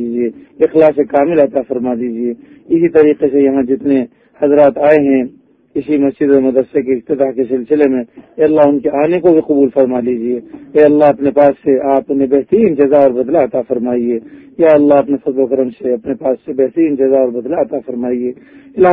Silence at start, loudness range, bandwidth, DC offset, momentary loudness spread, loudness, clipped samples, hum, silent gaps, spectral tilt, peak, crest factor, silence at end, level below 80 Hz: 0 s; 3 LU; 3.9 kHz; under 0.1%; 9 LU; -12 LUFS; 0.1%; none; none; -10.5 dB/octave; 0 dBFS; 12 dB; 0 s; -52 dBFS